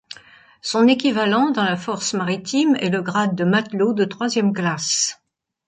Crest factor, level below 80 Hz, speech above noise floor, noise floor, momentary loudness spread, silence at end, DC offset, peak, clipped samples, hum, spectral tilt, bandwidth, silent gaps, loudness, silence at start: 16 dB; -66 dBFS; 29 dB; -48 dBFS; 6 LU; 0.55 s; under 0.1%; -4 dBFS; under 0.1%; none; -4 dB/octave; 9.6 kHz; none; -19 LUFS; 0.1 s